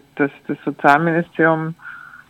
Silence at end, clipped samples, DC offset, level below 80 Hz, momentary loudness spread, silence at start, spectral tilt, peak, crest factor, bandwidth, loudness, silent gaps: 0.15 s; under 0.1%; under 0.1%; -64 dBFS; 16 LU; 0.15 s; -7.5 dB/octave; 0 dBFS; 18 dB; 13.5 kHz; -18 LUFS; none